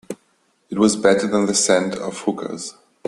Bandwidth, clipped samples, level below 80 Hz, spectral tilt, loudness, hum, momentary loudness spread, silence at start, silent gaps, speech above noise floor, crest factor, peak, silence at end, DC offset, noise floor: 12.5 kHz; under 0.1%; -58 dBFS; -3.5 dB/octave; -19 LUFS; none; 16 LU; 0.1 s; none; 44 dB; 20 dB; 0 dBFS; 0.35 s; under 0.1%; -63 dBFS